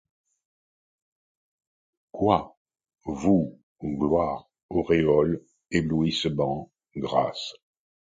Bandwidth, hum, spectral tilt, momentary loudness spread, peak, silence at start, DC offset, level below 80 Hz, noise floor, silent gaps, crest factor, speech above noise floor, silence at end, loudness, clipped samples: 9.2 kHz; none; -6.5 dB/octave; 15 LU; -6 dBFS; 2.15 s; under 0.1%; -50 dBFS; under -90 dBFS; 2.57-2.65 s, 3.63-3.76 s, 4.63-4.69 s; 22 dB; over 66 dB; 0.65 s; -26 LUFS; under 0.1%